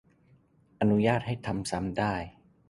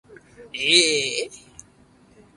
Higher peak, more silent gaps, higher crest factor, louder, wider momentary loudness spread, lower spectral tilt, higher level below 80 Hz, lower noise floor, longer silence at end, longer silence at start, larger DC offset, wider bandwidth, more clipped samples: second, -10 dBFS vs -2 dBFS; neither; about the same, 20 dB vs 24 dB; second, -29 LUFS vs -19 LUFS; second, 9 LU vs 19 LU; first, -6.5 dB/octave vs -0.5 dB/octave; first, -54 dBFS vs -62 dBFS; first, -63 dBFS vs -55 dBFS; second, 0.4 s vs 1 s; first, 0.8 s vs 0.1 s; neither; about the same, 11.5 kHz vs 11.5 kHz; neither